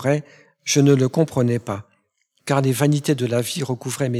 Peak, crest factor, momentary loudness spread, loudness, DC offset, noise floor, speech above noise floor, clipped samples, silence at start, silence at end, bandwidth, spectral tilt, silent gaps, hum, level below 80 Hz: -4 dBFS; 16 dB; 13 LU; -20 LUFS; under 0.1%; -68 dBFS; 48 dB; under 0.1%; 0 s; 0 s; 15 kHz; -5.5 dB/octave; none; none; -62 dBFS